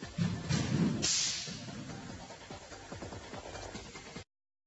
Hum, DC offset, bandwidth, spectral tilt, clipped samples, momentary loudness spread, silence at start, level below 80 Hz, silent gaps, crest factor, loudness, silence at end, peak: none; under 0.1%; 8.2 kHz; -3.5 dB/octave; under 0.1%; 18 LU; 0 s; -58 dBFS; none; 20 dB; -35 LUFS; 0.45 s; -18 dBFS